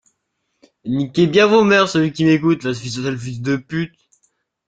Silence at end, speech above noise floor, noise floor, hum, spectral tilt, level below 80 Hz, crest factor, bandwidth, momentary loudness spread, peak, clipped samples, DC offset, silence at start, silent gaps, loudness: 0.8 s; 56 dB; -72 dBFS; none; -6 dB/octave; -56 dBFS; 18 dB; 9 kHz; 13 LU; 0 dBFS; under 0.1%; under 0.1%; 0.85 s; none; -17 LUFS